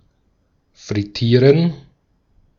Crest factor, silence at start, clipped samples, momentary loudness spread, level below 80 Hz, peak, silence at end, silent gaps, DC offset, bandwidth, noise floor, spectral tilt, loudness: 18 dB; 0.85 s; under 0.1%; 13 LU; -52 dBFS; -2 dBFS; 0.8 s; none; under 0.1%; 7.2 kHz; -62 dBFS; -7.5 dB/octave; -16 LUFS